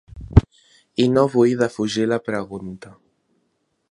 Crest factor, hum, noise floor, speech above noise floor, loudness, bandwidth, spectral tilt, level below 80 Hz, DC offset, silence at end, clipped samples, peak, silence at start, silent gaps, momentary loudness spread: 20 dB; none; -70 dBFS; 50 dB; -20 LUFS; 11.5 kHz; -7 dB/octave; -32 dBFS; under 0.1%; 1 s; under 0.1%; 0 dBFS; 0.15 s; none; 16 LU